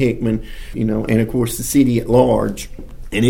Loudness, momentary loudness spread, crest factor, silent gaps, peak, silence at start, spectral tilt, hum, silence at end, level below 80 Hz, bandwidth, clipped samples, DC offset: -17 LUFS; 12 LU; 16 dB; none; 0 dBFS; 0 s; -6 dB/octave; none; 0 s; -32 dBFS; 17 kHz; under 0.1%; under 0.1%